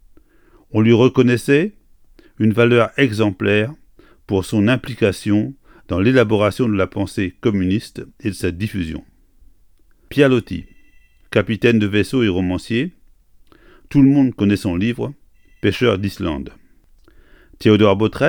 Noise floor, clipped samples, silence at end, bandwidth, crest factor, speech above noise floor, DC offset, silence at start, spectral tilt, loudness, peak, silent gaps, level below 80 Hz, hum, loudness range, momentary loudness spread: -51 dBFS; under 0.1%; 0 s; 18 kHz; 18 dB; 35 dB; under 0.1%; 0.7 s; -7 dB/octave; -17 LUFS; 0 dBFS; none; -44 dBFS; none; 5 LU; 13 LU